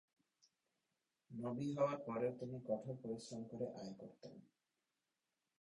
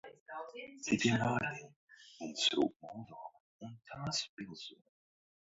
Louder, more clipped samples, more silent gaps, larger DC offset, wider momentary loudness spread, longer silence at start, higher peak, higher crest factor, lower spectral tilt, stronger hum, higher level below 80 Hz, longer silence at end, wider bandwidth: second, -45 LUFS vs -36 LUFS; neither; second, none vs 0.20-0.26 s, 1.76-1.88 s, 2.76-2.80 s, 3.40-3.59 s, 4.29-4.37 s; neither; second, 17 LU vs 21 LU; first, 1.3 s vs 0.05 s; second, -26 dBFS vs -18 dBFS; about the same, 22 dB vs 22 dB; first, -7 dB/octave vs -3 dB/octave; neither; second, -82 dBFS vs -70 dBFS; first, 1.15 s vs 0.7 s; first, 10.5 kHz vs 7.6 kHz